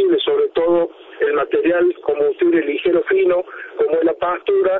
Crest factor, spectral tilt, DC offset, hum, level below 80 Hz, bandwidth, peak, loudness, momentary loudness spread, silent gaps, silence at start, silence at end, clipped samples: 12 dB; -8.5 dB/octave; under 0.1%; none; -58 dBFS; 4.1 kHz; -4 dBFS; -17 LUFS; 5 LU; none; 0 s; 0 s; under 0.1%